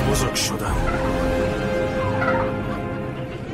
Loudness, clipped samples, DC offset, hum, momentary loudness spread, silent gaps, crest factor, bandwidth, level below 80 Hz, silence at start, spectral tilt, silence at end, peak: -23 LUFS; under 0.1%; under 0.1%; none; 7 LU; none; 14 dB; 16 kHz; -32 dBFS; 0 s; -5 dB/octave; 0 s; -8 dBFS